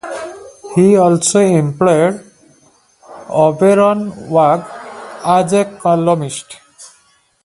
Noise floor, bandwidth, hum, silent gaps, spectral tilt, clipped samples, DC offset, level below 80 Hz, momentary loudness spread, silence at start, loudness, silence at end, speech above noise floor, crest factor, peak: -54 dBFS; 11.5 kHz; none; none; -6 dB/octave; under 0.1%; under 0.1%; -56 dBFS; 19 LU; 0.05 s; -13 LUFS; 0.6 s; 42 dB; 14 dB; 0 dBFS